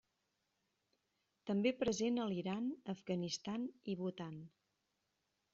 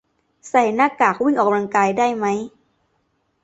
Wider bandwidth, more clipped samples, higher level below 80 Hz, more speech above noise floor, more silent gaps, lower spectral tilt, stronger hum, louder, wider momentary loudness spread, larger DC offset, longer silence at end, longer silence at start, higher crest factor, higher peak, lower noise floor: second, 7.4 kHz vs 8.2 kHz; neither; second, -74 dBFS vs -64 dBFS; second, 46 dB vs 50 dB; neither; about the same, -5.5 dB/octave vs -5.5 dB/octave; neither; second, -41 LUFS vs -18 LUFS; first, 12 LU vs 6 LU; neither; about the same, 1.05 s vs 0.95 s; first, 1.45 s vs 0.45 s; about the same, 18 dB vs 18 dB; second, -24 dBFS vs -2 dBFS; first, -86 dBFS vs -67 dBFS